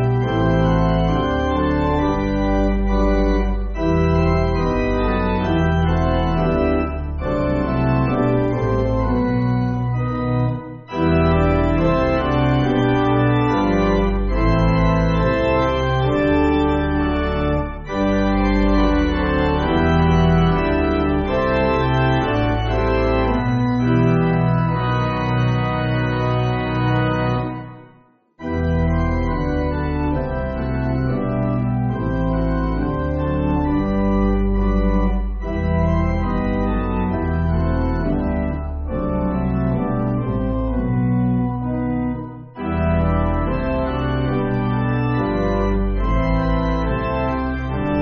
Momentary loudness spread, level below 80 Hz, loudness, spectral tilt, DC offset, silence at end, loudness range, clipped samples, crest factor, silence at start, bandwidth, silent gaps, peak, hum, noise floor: 5 LU; -26 dBFS; -19 LUFS; -7 dB/octave; under 0.1%; 0 s; 4 LU; under 0.1%; 14 dB; 0 s; 6.6 kHz; none; -4 dBFS; none; -52 dBFS